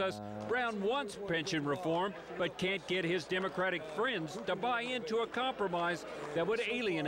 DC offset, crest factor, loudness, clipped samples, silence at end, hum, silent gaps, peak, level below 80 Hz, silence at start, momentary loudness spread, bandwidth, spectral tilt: under 0.1%; 10 dB; -35 LUFS; under 0.1%; 0 s; none; none; -24 dBFS; -68 dBFS; 0 s; 4 LU; 16.5 kHz; -4.5 dB/octave